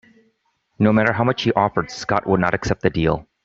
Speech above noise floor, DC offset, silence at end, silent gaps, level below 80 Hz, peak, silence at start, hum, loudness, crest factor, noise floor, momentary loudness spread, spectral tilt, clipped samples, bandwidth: 49 dB; under 0.1%; 0.25 s; none; -44 dBFS; -2 dBFS; 0.8 s; none; -19 LUFS; 18 dB; -68 dBFS; 6 LU; -6.5 dB/octave; under 0.1%; 7.8 kHz